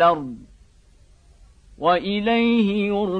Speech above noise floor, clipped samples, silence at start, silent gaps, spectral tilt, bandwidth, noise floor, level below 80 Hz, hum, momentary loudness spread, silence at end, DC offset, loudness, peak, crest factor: 33 dB; under 0.1%; 0 s; none; -7.5 dB/octave; 6 kHz; -52 dBFS; -50 dBFS; none; 12 LU; 0 s; under 0.1%; -20 LUFS; -6 dBFS; 16 dB